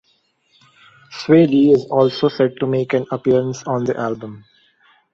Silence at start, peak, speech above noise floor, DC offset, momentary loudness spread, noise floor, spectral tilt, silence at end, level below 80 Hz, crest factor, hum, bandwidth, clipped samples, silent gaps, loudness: 1.1 s; -2 dBFS; 46 dB; under 0.1%; 15 LU; -62 dBFS; -7 dB/octave; 0.75 s; -58 dBFS; 16 dB; none; 7.6 kHz; under 0.1%; none; -17 LUFS